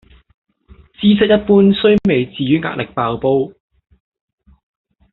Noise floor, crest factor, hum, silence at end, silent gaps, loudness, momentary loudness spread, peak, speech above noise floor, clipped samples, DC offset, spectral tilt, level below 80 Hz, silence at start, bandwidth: -46 dBFS; 14 dB; none; 1.65 s; none; -14 LUFS; 9 LU; -2 dBFS; 33 dB; under 0.1%; under 0.1%; -5.5 dB/octave; -46 dBFS; 1 s; 4.2 kHz